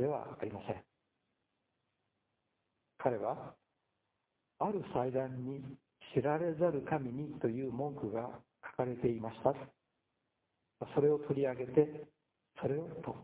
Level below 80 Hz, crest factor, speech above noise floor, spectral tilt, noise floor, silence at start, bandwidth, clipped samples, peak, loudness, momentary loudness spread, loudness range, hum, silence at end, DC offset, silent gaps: -70 dBFS; 24 dB; 49 dB; -7.5 dB/octave; -85 dBFS; 0 s; 4 kHz; under 0.1%; -14 dBFS; -37 LUFS; 15 LU; 8 LU; none; 0 s; under 0.1%; none